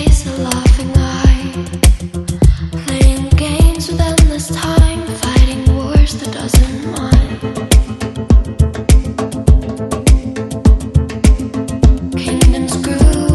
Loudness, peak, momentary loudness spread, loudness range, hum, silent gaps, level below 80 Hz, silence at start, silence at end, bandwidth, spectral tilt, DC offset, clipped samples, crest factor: -14 LUFS; 0 dBFS; 8 LU; 1 LU; none; none; -14 dBFS; 0 s; 0 s; 12.5 kHz; -5.5 dB/octave; under 0.1%; 0.2%; 12 dB